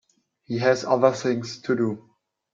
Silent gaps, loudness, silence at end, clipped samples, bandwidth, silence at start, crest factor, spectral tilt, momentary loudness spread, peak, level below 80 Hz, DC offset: none; -23 LUFS; 0.55 s; under 0.1%; 7.8 kHz; 0.5 s; 20 dB; -5.5 dB/octave; 10 LU; -4 dBFS; -70 dBFS; under 0.1%